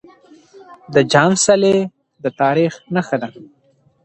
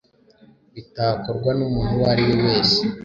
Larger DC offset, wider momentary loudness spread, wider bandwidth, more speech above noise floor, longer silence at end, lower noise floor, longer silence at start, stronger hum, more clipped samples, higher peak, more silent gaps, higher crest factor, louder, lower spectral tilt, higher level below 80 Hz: neither; first, 14 LU vs 7 LU; first, 9.4 kHz vs 7.6 kHz; about the same, 31 dB vs 33 dB; first, 0.6 s vs 0 s; second, -46 dBFS vs -53 dBFS; about the same, 0.7 s vs 0.75 s; neither; neither; first, 0 dBFS vs -6 dBFS; neither; about the same, 18 dB vs 16 dB; first, -16 LUFS vs -20 LUFS; second, -4.5 dB/octave vs -6.5 dB/octave; second, -58 dBFS vs -40 dBFS